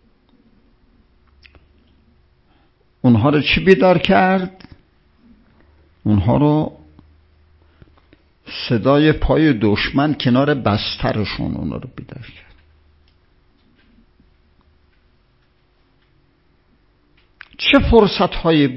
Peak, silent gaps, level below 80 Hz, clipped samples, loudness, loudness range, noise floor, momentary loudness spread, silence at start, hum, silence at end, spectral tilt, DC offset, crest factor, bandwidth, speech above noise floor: 0 dBFS; none; -36 dBFS; under 0.1%; -16 LUFS; 8 LU; -58 dBFS; 15 LU; 3.05 s; none; 0 s; -8.5 dB/octave; under 0.1%; 20 dB; 7.2 kHz; 43 dB